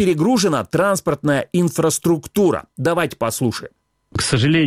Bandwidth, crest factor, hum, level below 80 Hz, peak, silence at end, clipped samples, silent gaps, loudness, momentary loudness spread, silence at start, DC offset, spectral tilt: 16 kHz; 14 dB; none; -48 dBFS; -4 dBFS; 0 s; under 0.1%; none; -18 LUFS; 6 LU; 0 s; under 0.1%; -5 dB/octave